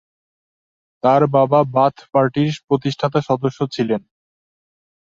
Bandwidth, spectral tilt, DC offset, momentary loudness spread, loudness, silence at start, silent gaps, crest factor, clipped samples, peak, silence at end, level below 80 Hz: 7.6 kHz; -7.5 dB/octave; under 0.1%; 8 LU; -18 LUFS; 1.05 s; 2.64-2.68 s; 18 dB; under 0.1%; -2 dBFS; 1.15 s; -60 dBFS